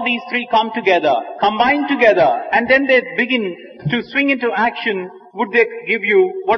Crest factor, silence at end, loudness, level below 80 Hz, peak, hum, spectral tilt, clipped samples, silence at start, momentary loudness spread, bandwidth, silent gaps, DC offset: 16 dB; 0 s; -16 LUFS; -56 dBFS; 0 dBFS; none; -6.5 dB/octave; under 0.1%; 0 s; 9 LU; 6.4 kHz; none; under 0.1%